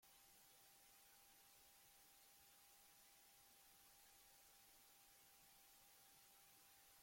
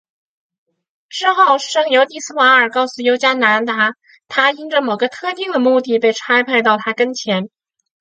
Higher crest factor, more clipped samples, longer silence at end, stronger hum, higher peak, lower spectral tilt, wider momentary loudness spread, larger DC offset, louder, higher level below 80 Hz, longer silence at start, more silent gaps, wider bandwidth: about the same, 14 dB vs 16 dB; neither; second, 0 s vs 0.55 s; neither; second, -58 dBFS vs 0 dBFS; second, 0 dB/octave vs -3 dB/octave; second, 0 LU vs 8 LU; neither; second, -68 LUFS vs -15 LUFS; second, under -90 dBFS vs -72 dBFS; second, 0 s vs 1.1 s; neither; first, 16.5 kHz vs 9.2 kHz